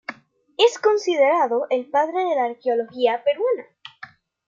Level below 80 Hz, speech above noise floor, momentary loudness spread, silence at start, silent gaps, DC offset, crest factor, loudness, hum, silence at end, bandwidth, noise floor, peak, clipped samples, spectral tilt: -82 dBFS; 25 dB; 14 LU; 0.1 s; none; under 0.1%; 18 dB; -21 LUFS; none; 0.4 s; 7.6 kHz; -45 dBFS; -4 dBFS; under 0.1%; -2.5 dB/octave